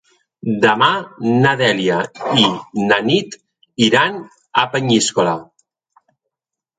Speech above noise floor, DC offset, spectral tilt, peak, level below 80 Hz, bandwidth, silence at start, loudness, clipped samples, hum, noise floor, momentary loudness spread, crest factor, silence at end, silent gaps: 69 dB; under 0.1%; -4 dB/octave; 0 dBFS; -60 dBFS; 9.4 kHz; 0.45 s; -16 LUFS; under 0.1%; none; -85 dBFS; 10 LU; 18 dB; 1.35 s; none